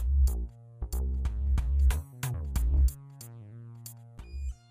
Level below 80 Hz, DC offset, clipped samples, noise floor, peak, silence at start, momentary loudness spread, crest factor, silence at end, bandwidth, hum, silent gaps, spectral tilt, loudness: -30 dBFS; under 0.1%; under 0.1%; -47 dBFS; -16 dBFS; 0 s; 19 LU; 12 dB; 0.15 s; 16 kHz; none; none; -6 dB/octave; -31 LUFS